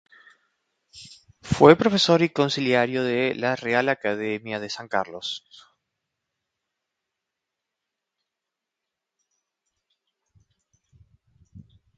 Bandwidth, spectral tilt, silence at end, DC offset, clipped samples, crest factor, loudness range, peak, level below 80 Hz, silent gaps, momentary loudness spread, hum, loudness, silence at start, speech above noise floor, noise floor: 9.2 kHz; -5 dB/octave; 0.4 s; under 0.1%; under 0.1%; 26 dB; 15 LU; 0 dBFS; -58 dBFS; none; 15 LU; none; -22 LUFS; 0.95 s; 64 dB; -85 dBFS